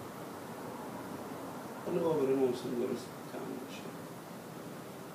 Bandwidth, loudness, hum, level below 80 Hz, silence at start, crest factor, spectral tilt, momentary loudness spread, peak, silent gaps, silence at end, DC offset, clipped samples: 15.5 kHz; -38 LUFS; none; -78 dBFS; 0 s; 18 dB; -6 dB/octave; 15 LU; -20 dBFS; none; 0 s; under 0.1%; under 0.1%